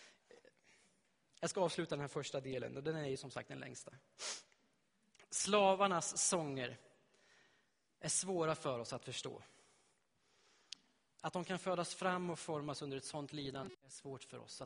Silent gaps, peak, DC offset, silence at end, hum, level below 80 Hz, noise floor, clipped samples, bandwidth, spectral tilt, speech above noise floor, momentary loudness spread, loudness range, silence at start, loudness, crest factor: none; -18 dBFS; under 0.1%; 0 s; none; -78 dBFS; -79 dBFS; under 0.1%; 10.5 kHz; -3.5 dB/octave; 38 dB; 17 LU; 8 LU; 0 s; -40 LUFS; 24 dB